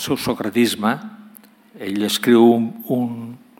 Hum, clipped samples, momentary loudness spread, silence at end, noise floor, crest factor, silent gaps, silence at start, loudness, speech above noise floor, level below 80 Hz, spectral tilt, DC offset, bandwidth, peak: none; under 0.1%; 16 LU; 0.25 s; -47 dBFS; 18 dB; none; 0 s; -18 LUFS; 29 dB; -60 dBFS; -5 dB/octave; under 0.1%; 17 kHz; -2 dBFS